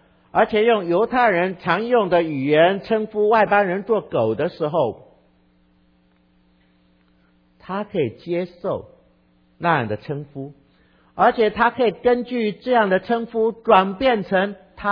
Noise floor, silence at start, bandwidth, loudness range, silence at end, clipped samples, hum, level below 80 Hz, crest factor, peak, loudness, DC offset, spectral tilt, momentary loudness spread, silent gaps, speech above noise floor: -59 dBFS; 0.35 s; 5.2 kHz; 12 LU; 0 s; under 0.1%; none; -56 dBFS; 20 dB; -2 dBFS; -20 LUFS; under 0.1%; -8.5 dB/octave; 11 LU; none; 40 dB